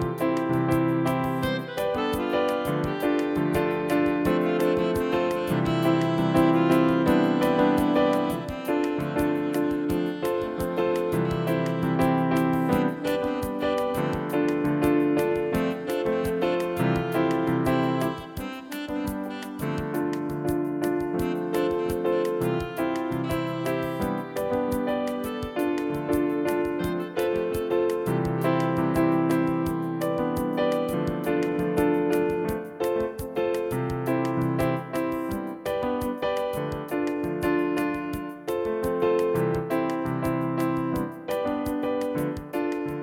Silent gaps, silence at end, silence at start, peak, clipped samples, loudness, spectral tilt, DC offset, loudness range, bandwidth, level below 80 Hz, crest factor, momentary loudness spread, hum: none; 0 s; 0 s; -8 dBFS; under 0.1%; -26 LUFS; -7 dB/octave; under 0.1%; 5 LU; 17 kHz; -48 dBFS; 16 dB; 7 LU; none